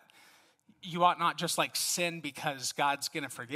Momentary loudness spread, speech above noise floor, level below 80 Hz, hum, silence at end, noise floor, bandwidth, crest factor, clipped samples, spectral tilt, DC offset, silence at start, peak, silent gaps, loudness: 10 LU; 32 dB; -82 dBFS; none; 0 s; -64 dBFS; 16 kHz; 22 dB; under 0.1%; -2.5 dB/octave; under 0.1%; 0.85 s; -12 dBFS; none; -31 LUFS